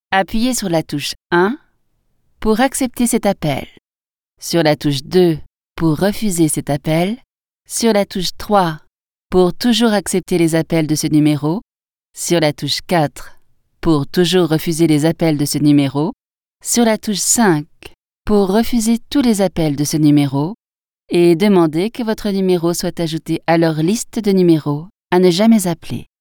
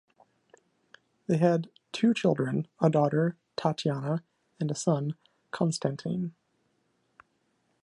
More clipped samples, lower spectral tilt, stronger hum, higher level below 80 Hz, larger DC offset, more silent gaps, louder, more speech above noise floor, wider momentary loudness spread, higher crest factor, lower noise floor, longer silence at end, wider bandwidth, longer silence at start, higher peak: neither; second, -5 dB/octave vs -6.5 dB/octave; neither; first, -38 dBFS vs -74 dBFS; neither; neither; first, -16 LUFS vs -29 LUFS; first, over 75 dB vs 46 dB; about the same, 9 LU vs 11 LU; second, 16 dB vs 22 dB; first, under -90 dBFS vs -73 dBFS; second, 0.15 s vs 1.55 s; first, 19.5 kHz vs 11 kHz; second, 0.1 s vs 1.3 s; first, 0 dBFS vs -8 dBFS